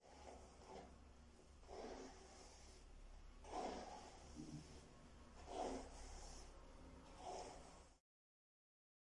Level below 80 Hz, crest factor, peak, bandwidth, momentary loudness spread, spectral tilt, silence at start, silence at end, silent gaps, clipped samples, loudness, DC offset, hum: -64 dBFS; 20 dB; -36 dBFS; 11 kHz; 15 LU; -4.5 dB/octave; 0 s; 1 s; none; under 0.1%; -57 LUFS; under 0.1%; none